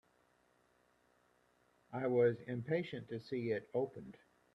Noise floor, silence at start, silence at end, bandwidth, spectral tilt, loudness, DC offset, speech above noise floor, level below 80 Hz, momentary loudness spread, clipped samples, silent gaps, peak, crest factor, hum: -74 dBFS; 1.9 s; 0.4 s; 6 kHz; -8.5 dB/octave; -38 LUFS; under 0.1%; 36 dB; -78 dBFS; 15 LU; under 0.1%; none; -22 dBFS; 20 dB; none